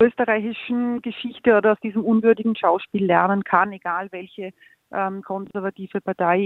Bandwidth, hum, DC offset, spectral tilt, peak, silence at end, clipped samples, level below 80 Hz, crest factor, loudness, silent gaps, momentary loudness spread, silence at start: 4.1 kHz; none; under 0.1%; -9 dB/octave; -2 dBFS; 0 s; under 0.1%; -64 dBFS; 20 dB; -21 LUFS; none; 13 LU; 0 s